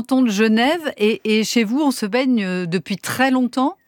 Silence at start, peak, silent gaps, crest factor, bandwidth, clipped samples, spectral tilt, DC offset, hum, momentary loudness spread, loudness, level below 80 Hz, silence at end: 0 s; -2 dBFS; none; 16 dB; 18.5 kHz; under 0.1%; -4.5 dB/octave; under 0.1%; none; 7 LU; -18 LUFS; -66 dBFS; 0.15 s